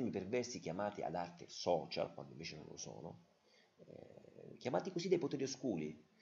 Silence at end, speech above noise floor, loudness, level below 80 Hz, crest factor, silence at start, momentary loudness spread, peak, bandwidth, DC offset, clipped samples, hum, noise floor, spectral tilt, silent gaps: 0.2 s; 26 dB; -42 LUFS; -80 dBFS; 22 dB; 0 s; 20 LU; -22 dBFS; 7.6 kHz; under 0.1%; under 0.1%; none; -68 dBFS; -5 dB/octave; none